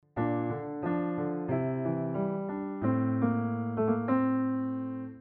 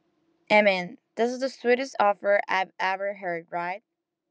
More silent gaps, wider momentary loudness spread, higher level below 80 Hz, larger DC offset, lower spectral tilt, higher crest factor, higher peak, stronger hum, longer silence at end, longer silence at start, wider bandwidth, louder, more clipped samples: neither; second, 7 LU vs 12 LU; first, -66 dBFS vs under -90 dBFS; neither; first, -10 dB/octave vs -4.5 dB/octave; second, 14 dB vs 20 dB; second, -16 dBFS vs -6 dBFS; neither; second, 0 s vs 0.5 s; second, 0.15 s vs 0.5 s; second, 3.5 kHz vs 8 kHz; second, -31 LUFS vs -25 LUFS; neither